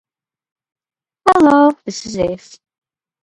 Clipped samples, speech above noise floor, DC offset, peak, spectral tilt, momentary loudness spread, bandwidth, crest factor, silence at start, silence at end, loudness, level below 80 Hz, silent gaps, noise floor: under 0.1%; 50 dB; under 0.1%; 0 dBFS; -5 dB/octave; 15 LU; 11 kHz; 16 dB; 1.25 s; 0.85 s; -14 LUFS; -50 dBFS; none; -64 dBFS